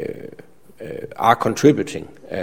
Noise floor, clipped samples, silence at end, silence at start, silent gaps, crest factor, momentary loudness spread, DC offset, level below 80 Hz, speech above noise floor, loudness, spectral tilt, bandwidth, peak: -45 dBFS; under 0.1%; 0 s; 0 s; none; 20 dB; 21 LU; 0.5%; -54 dBFS; 27 dB; -18 LUFS; -5.5 dB/octave; 16.5 kHz; 0 dBFS